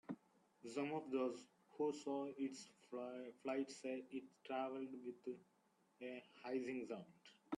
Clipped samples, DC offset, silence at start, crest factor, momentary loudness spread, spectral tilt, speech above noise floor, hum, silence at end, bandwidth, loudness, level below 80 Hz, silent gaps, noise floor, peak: under 0.1%; under 0.1%; 0.1 s; 18 dB; 12 LU; -5 dB/octave; 26 dB; none; 0 s; 11.5 kHz; -48 LUFS; under -90 dBFS; none; -73 dBFS; -30 dBFS